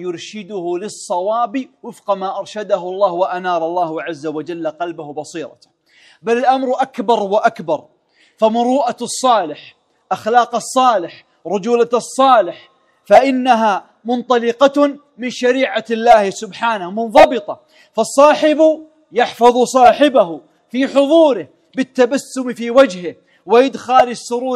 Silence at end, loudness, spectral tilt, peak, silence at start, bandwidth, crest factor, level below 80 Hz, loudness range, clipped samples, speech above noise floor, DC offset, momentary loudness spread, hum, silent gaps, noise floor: 0 s; -15 LUFS; -4 dB/octave; 0 dBFS; 0 s; 14 kHz; 16 dB; -56 dBFS; 7 LU; 0.3%; 36 dB; under 0.1%; 15 LU; none; none; -50 dBFS